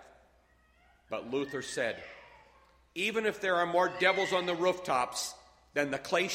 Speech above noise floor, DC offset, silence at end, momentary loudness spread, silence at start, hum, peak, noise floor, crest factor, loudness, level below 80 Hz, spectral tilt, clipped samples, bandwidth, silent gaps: 35 dB; under 0.1%; 0 s; 14 LU; 0 s; none; -12 dBFS; -66 dBFS; 22 dB; -31 LUFS; -68 dBFS; -3 dB/octave; under 0.1%; 16 kHz; none